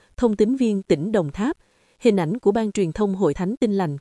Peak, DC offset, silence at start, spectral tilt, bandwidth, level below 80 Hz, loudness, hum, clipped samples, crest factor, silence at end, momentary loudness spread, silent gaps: -4 dBFS; under 0.1%; 0.2 s; -7 dB/octave; 11.5 kHz; -48 dBFS; -22 LUFS; none; under 0.1%; 16 dB; 0 s; 5 LU; none